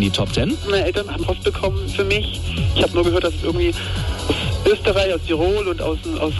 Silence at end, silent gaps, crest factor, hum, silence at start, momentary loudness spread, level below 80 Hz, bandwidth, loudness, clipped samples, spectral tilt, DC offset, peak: 0 s; none; 14 dB; none; 0 s; 6 LU; -28 dBFS; 12 kHz; -20 LUFS; under 0.1%; -5.5 dB/octave; under 0.1%; -4 dBFS